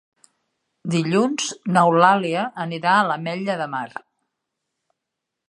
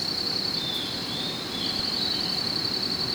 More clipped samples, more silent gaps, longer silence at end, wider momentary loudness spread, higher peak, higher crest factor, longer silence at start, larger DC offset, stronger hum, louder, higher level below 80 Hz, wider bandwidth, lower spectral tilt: neither; neither; first, 1.6 s vs 0 s; first, 13 LU vs 4 LU; first, 0 dBFS vs -14 dBFS; first, 22 dB vs 14 dB; first, 0.85 s vs 0 s; neither; neither; first, -20 LUFS vs -26 LUFS; second, -72 dBFS vs -54 dBFS; second, 11 kHz vs over 20 kHz; first, -5 dB/octave vs -3 dB/octave